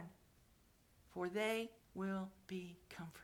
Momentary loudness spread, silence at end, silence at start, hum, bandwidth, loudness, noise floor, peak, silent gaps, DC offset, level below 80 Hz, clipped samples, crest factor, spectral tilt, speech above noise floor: 14 LU; 0 s; 0 s; none; 19 kHz; -45 LUFS; -71 dBFS; -28 dBFS; none; under 0.1%; -74 dBFS; under 0.1%; 20 dB; -5.5 dB/octave; 27 dB